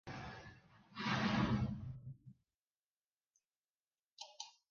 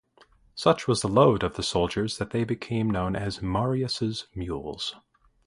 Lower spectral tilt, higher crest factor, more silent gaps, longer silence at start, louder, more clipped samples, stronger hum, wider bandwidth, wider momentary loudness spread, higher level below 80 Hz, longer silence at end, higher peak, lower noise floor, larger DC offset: about the same, -4.5 dB/octave vs -5.5 dB/octave; about the same, 20 dB vs 22 dB; first, 2.56-2.62 s, 2.72-2.96 s, 3.12-3.19 s, 3.30-3.34 s, 3.45-3.50 s, 3.58-3.62 s, 3.70-3.91 s, 4.12-4.17 s vs none; second, 0.05 s vs 0.55 s; second, -40 LUFS vs -26 LUFS; neither; neither; second, 7.2 kHz vs 11.5 kHz; first, 20 LU vs 13 LU; second, -62 dBFS vs -46 dBFS; second, 0.2 s vs 0.5 s; second, -24 dBFS vs -4 dBFS; first, under -90 dBFS vs -59 dBFS; neither